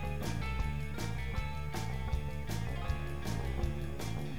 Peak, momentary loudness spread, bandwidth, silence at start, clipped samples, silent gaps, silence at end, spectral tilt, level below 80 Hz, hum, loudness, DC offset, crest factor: -22 dBFS; 2 LU; 19 kHz; 0 s; under 0.1%; none; 0 s; -6 dB/octave; -40 dBFS; none; -38 LUFS; 0.8%; 14 dB